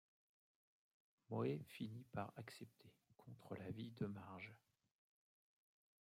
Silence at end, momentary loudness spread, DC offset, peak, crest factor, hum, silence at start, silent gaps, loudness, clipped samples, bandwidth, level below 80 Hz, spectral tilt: 1.45 s; 17 LU; under 0.1%; -32 dBFS; 22 dB; none; 1.3 s; none; -51 LUFS; under 0.1%; 16 kHz; -86 dBFS; -7.5 dB/octave